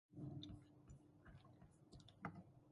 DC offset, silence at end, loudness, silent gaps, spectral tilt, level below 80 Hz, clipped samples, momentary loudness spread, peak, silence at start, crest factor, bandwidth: under 0.1%; 0 s; -60 LUFS; none; -6.5 dB/octave; -72 dBFS; under 0.1%; 12 LU; -36 dBFS; 0.1 s; 24 dB; 11 kHz